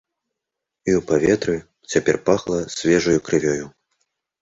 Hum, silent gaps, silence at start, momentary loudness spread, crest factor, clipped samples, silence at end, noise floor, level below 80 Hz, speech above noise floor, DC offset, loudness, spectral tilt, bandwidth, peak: none; none; 0.85 s; 9 LU; 18 dB; under 0.1%; 0.7 s; -83 dBFS; -50 dBFS; 64 dB; under 0.1%; -20 LUFS; -5 dB/octave; 8 kHz; -2 dBFS